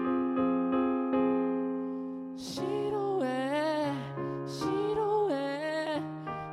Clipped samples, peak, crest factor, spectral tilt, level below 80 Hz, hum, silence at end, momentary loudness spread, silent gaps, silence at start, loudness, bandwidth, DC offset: under 0.1%; -18 dBFS; 12 dB; -6.5 dB/octave; -66 dBFS; none; 0 s; 8 LU; none; 0 s; -31 LUFS; 12.5 kHz; under 0.1%